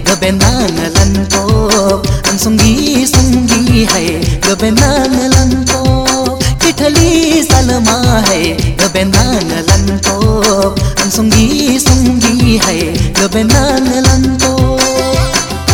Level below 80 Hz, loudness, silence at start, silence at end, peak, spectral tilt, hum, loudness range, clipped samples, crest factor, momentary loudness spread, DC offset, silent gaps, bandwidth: -20 dBFS; -9 LUFS; 0 s; 0 s; 0 dBFS; -4 dB/octave; none; 1 LU; 1%; 10 dB; 3 LU; under 0.1%; none; over 20 kHz